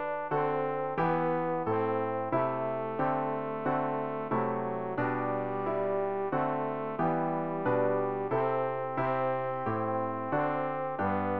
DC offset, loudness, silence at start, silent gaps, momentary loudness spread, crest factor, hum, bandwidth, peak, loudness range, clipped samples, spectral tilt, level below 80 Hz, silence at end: 0.3%; -31 LUFS; 0 s; none; 3 LU; 14 dB; none; 5.2 kHz; -16 dBFS; 1 LU; under 0.1%; -6.5 dB/octave; -68 dBFS; 0 s